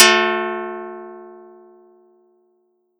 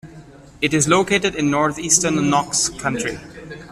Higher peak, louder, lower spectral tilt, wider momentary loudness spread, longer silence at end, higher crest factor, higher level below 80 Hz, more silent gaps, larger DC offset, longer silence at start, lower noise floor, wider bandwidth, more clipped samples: about the same, 0 dBFS vs 0 dBFS; about the same, -18 LUFS vs -18 LUFS; second, -0.5 dB/octave vs -3 dB/octave; first, 25 LU vs 11 LU; first, 1.6 s vs 0 s; about the same, 22 dB vs 20 dB; second, -84 dBFS vs -48 dBFS; neither; neither; about the same, 0 s vs 0.05 s; first, -65 dBFS vs -42 dBFS; about the same, 15.5 kHz vs 15 kHz; neither